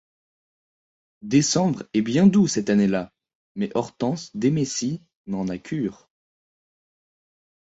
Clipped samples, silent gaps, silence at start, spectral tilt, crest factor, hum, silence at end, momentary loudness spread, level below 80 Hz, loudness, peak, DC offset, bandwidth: under 0.1%; 3.35-3.55 s, 5.15-5.25 s; 1.25 s; -5.5 dB/octave; 20 dB; none; 1.85 s; 13 LU; -60 dBFS; -23 LUFS; -6 dBFS; under 0.1%; 8 kHz